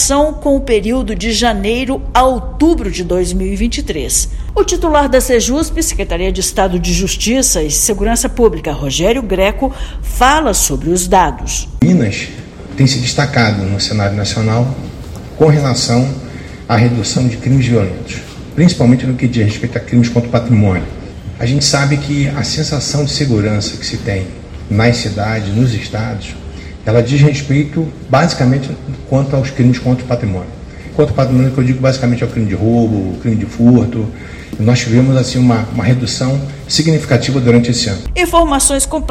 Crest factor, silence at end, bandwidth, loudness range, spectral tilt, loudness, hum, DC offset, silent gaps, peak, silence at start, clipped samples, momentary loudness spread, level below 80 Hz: 12 dB; 0 s; 15 kHz; 2 LU; -5 dB/octave; -13 LUFS; none; under 0.1%; none; 0 dBFS; 0 s; 0.3%; 10 LU; -26 dBFS